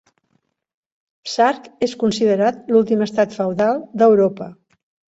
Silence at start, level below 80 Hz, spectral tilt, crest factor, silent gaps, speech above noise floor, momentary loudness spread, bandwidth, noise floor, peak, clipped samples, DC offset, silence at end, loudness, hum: 1.25 s; -62 dBFS; -5.5 dB/octave; 16 dB; none; 50 dB; 11 LU; 8 kHz; -67 dBFS; -2 dBFS; under 0.1%; under 0.1%; 0.6 s; -18 LUFS; none